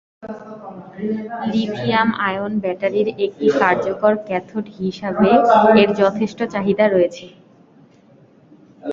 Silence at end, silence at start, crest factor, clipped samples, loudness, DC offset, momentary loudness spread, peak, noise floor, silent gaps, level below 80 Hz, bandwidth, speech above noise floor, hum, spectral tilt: 0 s; 0.2 s; 18 dB; under 0.1%; -18 LUFS; under 0.1%; 21 LU; 0 dBFS; -50 dBFS; none; -56 dBFS; 7.4 kHz; 32 dB; none; -7 dB/octave